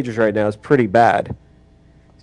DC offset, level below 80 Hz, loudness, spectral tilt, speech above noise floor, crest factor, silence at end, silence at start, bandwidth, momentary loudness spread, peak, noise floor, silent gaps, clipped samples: under 0.1%; -50 dBFS; -16 LUFS; -7.5 dB/octave; 33 dB; 18 dB; 0.85 s; 0 s; 10.5 kHz; 14 LU; 0 dBFS; -49 dBFS; none; under 0.1%